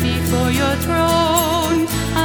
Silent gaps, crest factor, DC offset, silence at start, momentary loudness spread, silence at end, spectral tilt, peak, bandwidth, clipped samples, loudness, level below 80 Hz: none; 14 dB; under 0.1%; 0 s; 3 LU; 0 s; -4.5 dB/octave; -4 dBFS; over 20 kHz; under 0.1%; -17 LUFS; -30 dBFS